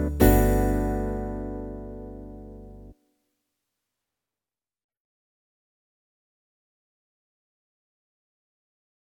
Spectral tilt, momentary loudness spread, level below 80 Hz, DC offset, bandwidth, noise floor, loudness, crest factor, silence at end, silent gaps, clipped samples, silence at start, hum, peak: -7 dB/octave; 24 LU; -34 dBFS; under 0.1%; 19.5 kHz; under -90 dBFS; -24 LUFS; 26 dB; 6.1 s; none; under 0.1%; 0 s; none; -4 dBFS